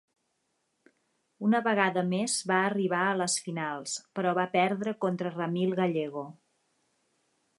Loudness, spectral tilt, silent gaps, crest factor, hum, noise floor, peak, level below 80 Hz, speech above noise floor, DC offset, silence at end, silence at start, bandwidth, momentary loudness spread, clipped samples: -29 LUFS; -4.5 dB/octave; none; 20 dB; none; -77 dBFS; -10 dBFS; -80 dBFS; 49 dB; under 0.1%; 1.25 s; 1.4 s; 11.5 kHz; 8 LU; under 0.1%